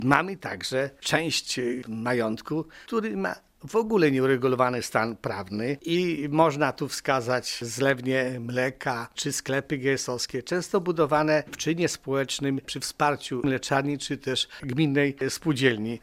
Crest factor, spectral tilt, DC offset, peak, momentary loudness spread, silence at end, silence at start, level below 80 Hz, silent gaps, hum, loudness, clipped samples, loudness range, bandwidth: 22 dB; -4.5 dB/octave; under 0.1%; -4 dBFS; 8 LU; 0.05 s; 0 s; -60 dBFS; none; none; -26 LUFS; under 0.1%; 2 LU; 16 kHz